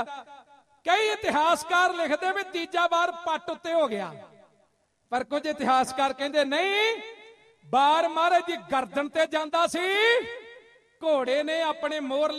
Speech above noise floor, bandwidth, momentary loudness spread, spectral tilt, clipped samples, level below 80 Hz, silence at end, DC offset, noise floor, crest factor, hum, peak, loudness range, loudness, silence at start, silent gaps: 43 dB; 13.5 kHz; 10 LU; -2.5 dB/octave; under 0.1%; -70 dBFS; 0 s; under 0.1%; -69 dBFS; 16 dB; none; -10 dBFS; 4 LU; -25 LUFS; 0 s; none